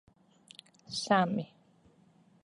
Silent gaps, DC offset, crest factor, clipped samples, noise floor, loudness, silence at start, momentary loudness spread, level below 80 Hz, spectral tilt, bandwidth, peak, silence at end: none; under 0.1%; 22 dB; under 0.1%; -64 dBFS; -31 LUFS; 0.9 s; 25 LU; -74 dBFS; -5 dB/octave; 11.5 kHz; -12 dBFS; 1 s